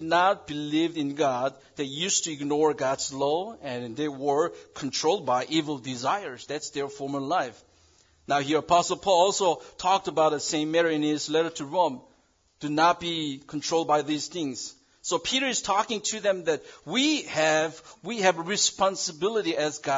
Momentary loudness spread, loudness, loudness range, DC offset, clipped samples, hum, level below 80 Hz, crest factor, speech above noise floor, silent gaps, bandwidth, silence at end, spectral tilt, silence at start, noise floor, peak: 10 LU; -26 LUFS; 4 LU; under 0.1%; under 0.1%; none; -66 dBFS; 20 dB; 38 dB; none; 7.8 kHz; 0 s; -3 dB/octave; 0 s; -65 dBFS; -8 dBFS